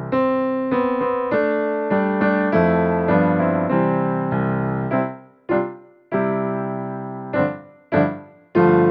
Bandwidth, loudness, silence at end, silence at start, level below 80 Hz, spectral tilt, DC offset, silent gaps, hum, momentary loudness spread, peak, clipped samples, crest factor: 5.4 kHz; -20 LUFS; 0 s; 0 s; -52 dBFS; -11 dB/octave; under 0.1%; none; none; 9 LU; -4 dBFS; under 0.1%; 16 dB